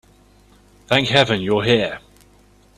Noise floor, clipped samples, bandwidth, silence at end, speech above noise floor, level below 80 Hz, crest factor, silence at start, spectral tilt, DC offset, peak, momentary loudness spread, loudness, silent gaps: -52 dBFS; under 0.1%; 13.5 kHz; 0.8 s; 35 dB; -50 dBFS; 20 dB; 0.9 s; -5 dB/octave; under 0.1%; 0 dBFS; 9 LU; -17 LUFS; none